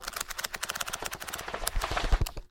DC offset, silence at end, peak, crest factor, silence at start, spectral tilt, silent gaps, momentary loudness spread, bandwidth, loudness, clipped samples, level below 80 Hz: under 0.1%; 0.05 s; -4 dBFS; 28 dB; 0 s; -2.5 dB/octave; none; 5 LU; 17 kHz; -33 LUFS; under 0.1%; -34 dBFS